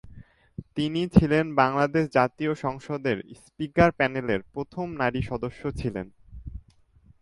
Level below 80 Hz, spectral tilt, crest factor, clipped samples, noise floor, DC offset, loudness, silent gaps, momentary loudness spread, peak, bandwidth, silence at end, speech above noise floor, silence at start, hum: -44 dBFS; -7.5 dB/octave; 24 dB; under 0.1%; -58 dBFS; under 0.1%; -26 LUFS; none; 21 LU; -2 dBFS; 11.5 kHz; 0.6 s; 33 dB; 0.05 s; none